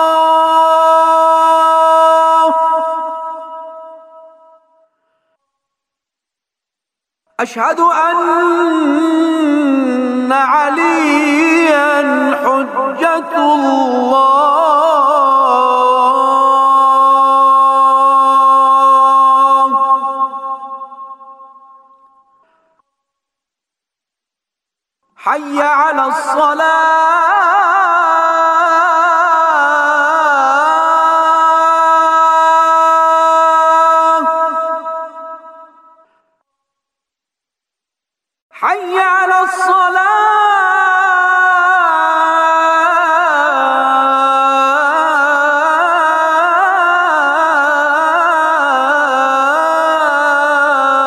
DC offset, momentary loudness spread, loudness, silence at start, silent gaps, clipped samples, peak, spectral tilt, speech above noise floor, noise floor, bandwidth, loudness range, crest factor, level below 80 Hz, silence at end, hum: under 0.1%; 7 LU; -10 LUFS; 0 s; 38.42-38.50 s; under 0.1%; -2 dBFS; -2 dB/octave; 72 dB; -83 dBFS; 13 kHz; 9 LU; 10 dB; -70 dBFS; 0 s; none